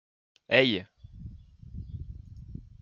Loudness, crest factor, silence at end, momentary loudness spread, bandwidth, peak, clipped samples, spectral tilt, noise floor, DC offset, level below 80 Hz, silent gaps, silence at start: -25 LUFS; 26 dB; 0.2 s; 24 LU; 7.2 kHz; -6 dBFS; under 0.1%; -6.5 dB/octave; -47 dBFS; under 0.1%; -50 dBFS; none; 0.5 s